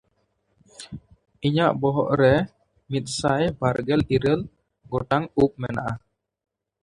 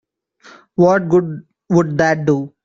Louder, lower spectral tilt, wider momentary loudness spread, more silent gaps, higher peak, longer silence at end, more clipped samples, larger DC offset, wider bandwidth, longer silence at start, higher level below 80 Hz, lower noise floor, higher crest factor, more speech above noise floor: second, -23 LUFS vs -15 LUFS; about the same, -6.5 dB/octave vs -7.5 dB/octave; first, 19 LU vs 14 LU; neither; second, -4 dBFS vs 0 dBFS; first, 0.85 s vs 0.15 s; neither; neither; first, 11.5 kHz vs 7.6 kHz; about the same, 0.8 s vs 0.8 s; first, -48 dBFS vs -54 dBFS; first, -70 dBFS vs -47 dBFS; about the same, 20 dB vs 16 dB; first, 48 dB vs 32 dB